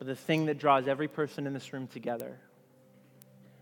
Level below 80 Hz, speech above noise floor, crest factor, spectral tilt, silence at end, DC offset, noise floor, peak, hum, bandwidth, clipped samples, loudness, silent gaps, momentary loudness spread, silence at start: -86 dBFS; 29 dB; 22 dB; -6.5 dB/octave; 1.25 s; under 0.1%; -61 dBFS; -10 dBFS; none; 18 kHz; under 0.1%; -31 LUFS; none; 13 LU; 0 s